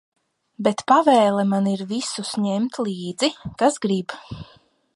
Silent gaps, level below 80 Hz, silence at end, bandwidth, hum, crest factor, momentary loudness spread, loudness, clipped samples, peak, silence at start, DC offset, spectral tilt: none; -58 dBFS; 0.5 s; 11.5 kHz; none; 18 dB; 11 LU; -21 LUFS; under 0.1%; -4 dBFS; 0.6 s; under 0.1%; -5 dB/octave